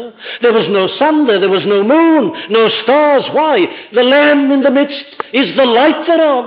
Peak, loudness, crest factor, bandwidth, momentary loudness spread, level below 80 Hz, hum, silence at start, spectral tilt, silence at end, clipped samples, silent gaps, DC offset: -2 dBFS; -11 LUFS; 10 dB; 5.2 kHz; 6 LU; -62 dBFS; none; 0 s; -8 dB/octave; 0 s; under 0.1%; none; under 0.1%